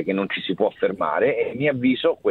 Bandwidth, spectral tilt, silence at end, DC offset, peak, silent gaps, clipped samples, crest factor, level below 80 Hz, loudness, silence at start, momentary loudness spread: 4.4 kHz; -8.5 dB/octave; 0 s; under 0.1%; -6 dBFS; none; under 0.1%; 16 dB; -62 dBFS; -22 LUFS; 0 s; 4 LU